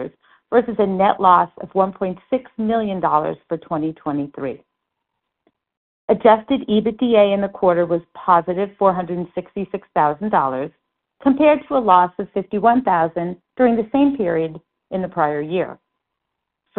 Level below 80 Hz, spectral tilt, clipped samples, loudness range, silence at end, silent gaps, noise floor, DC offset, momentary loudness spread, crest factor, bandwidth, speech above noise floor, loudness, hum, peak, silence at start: -56 dBFS; -5.5 dB/octave; under 0.1%; 6 LU; 1.05 s; 5.77-6.08 s; -79 dBFS; under 0.1%; 13 LU; 18 dB; 4.2 kHz; 61 dB; -19 LUFS; none; 0 dBFS; 0 s